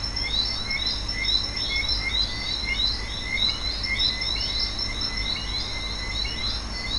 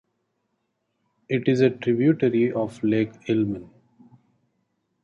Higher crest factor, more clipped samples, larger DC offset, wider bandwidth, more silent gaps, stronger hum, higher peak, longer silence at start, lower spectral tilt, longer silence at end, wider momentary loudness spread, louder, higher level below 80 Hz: about the same, 16 dB vs 18 dB; neither; neither; first, 11.5 kHz vs 7.6 kHz; neither; neither; second, -10 dBFS vs -6 dBFS; second, 0 s vs 1.3 s; second, -2.5 dB/octave vs -8 dB/octave; second, 0 s vs 1.4 s; about the same, 5 LU vs 7 LU; about the same, -24 LUFS vs -23 LUFS; first, -34 dBFS vs -62 dBFS